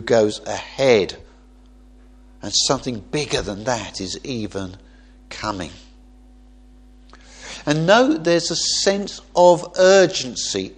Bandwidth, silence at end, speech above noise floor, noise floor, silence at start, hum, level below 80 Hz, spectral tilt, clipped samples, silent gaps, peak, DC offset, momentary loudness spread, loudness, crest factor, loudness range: 10.5 kHz; 0.05 s; 29 dB; -47 dBFS; 0 s; none; -46 dBFS; -3.5 dB/octave; under 0.1%; none; 0 dBFS; under 0.1%; 16 LU; -19 LUFS; 20 dB; 15 LU